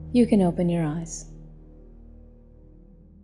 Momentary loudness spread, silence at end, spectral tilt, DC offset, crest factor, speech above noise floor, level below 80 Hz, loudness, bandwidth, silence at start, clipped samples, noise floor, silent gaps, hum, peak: 23 LU; 1.2 s; -7 dB/octave; under 0.1%; 18 dB; 28 dB; -46 dBFS; -23 LUFS; 11.5 kHz; 0 s; under 0.1%; -50 dBFS; none; none; -8 dBFS